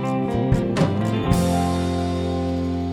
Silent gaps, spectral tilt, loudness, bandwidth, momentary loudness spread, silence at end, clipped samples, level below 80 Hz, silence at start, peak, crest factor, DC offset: none; -7 dB/octave; -22 LUFS; 16.5 kHz; 4 LU; 0 s; under 0.1%; -36 dBFS; 0 s; -4 dBFS; 16 dB; under 0.1%